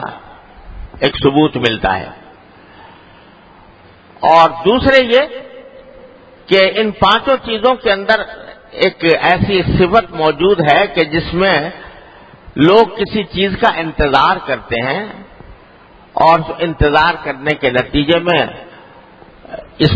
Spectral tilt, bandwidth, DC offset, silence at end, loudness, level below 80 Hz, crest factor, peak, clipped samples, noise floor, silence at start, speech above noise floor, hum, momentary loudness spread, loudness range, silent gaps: -7 dB/octave; 8 kHz; under 0.1%; 0 s; -13 LUFS; -34 dBFS; 14 dB; 0 dBFS; 0.1%; -42 dBFS; 0 s; 30 dB; none; 14 LU; 4 LU; none